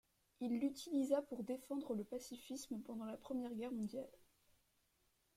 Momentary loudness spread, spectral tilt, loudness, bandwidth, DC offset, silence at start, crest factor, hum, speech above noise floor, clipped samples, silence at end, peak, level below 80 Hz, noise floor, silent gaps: 10 LU; -5.5 dB/octave; -45 LUFS; 16 kHz; under 0.1%; 0.4 s; 20 dB; none; 37 dB; under 0.1%; 1.2 s; -24 dBFS; -80 dBFS; -80 dBFS; none